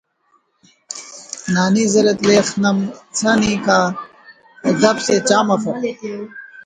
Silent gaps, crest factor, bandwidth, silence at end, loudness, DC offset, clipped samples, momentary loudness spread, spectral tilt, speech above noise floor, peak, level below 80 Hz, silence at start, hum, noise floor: none; 18 dB; 9.6 kHz; 0.05 s; -16 LUFS; under 0.1%; under 0.1%; 16 LU; -4.5 dB/octave; 46 dB; 0 dBFS; -54 dBFS; 0.9 s; none; -61 dBFS